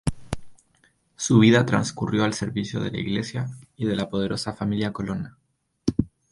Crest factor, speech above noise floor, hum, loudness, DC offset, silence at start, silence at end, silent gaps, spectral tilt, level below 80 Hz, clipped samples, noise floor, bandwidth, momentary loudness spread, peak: 20 dB; 41 dB; none; -24 LUFS; under 0.1%; 0.05 s; 0.25 s; none; -5.5 dB/octave; -46 dBFS; under 0.1%; -64 dBFS; 11.5 kHz; 15 LU; -4 dBFS